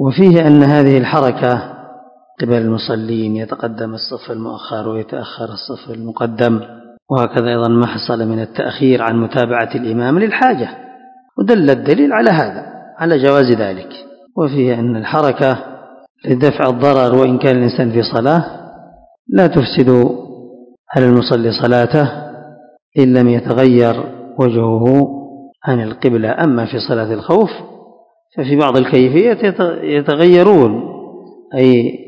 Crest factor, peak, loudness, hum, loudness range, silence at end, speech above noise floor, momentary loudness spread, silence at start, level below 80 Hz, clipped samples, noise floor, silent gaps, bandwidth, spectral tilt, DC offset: 14 dB; 0 dBFS; -13 LUFS; none; 7 LU; 0.05 s; 34 dB; 15 LU; 0 s; -52 dBFS; 0.7%; -47 dBFS; 7.02-7.06 s, 16.10-16.15 s, 19.19-19.25 s, 20.79-20.84 s, 22.82-22.92 s; 7 kHz; -9 dB/octave; under 0.1%